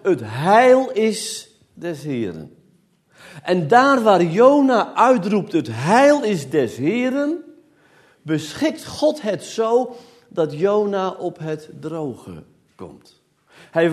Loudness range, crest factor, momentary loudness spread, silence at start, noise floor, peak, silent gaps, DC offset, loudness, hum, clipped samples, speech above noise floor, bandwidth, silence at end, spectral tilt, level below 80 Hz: 9 LU; 18 dB; 17 LU; 0.05 s; -58 dBFS; 0 dBFS; none; under 0.1%; -18 LUFS; none; under 0.1%; 40 dB; 13.5 kHz; 0 s; -5.5 dB/octave; -64 dBFS